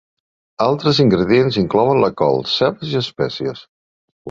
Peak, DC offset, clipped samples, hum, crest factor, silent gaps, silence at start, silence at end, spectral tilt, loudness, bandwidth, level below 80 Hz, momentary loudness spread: -2 dBFS; under 0.1%; under 0.1%; none; 16 dB; 3.69-4.25 s; 0.6 s; 0 s; -7 dB/octave; -16 LUFS; 7.6 kHz; -48 dBFS; 8 LU